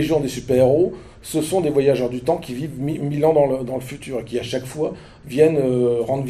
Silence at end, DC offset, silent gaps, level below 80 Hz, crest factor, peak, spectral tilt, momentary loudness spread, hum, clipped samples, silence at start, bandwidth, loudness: 0 s; under 0.1%; none; -48 dBFS; 18 dB; -2 dBFS; -6.5 dB/octave; 12 LU; none; under 0.1%; 0 s; 14 kHz; -20 LUFS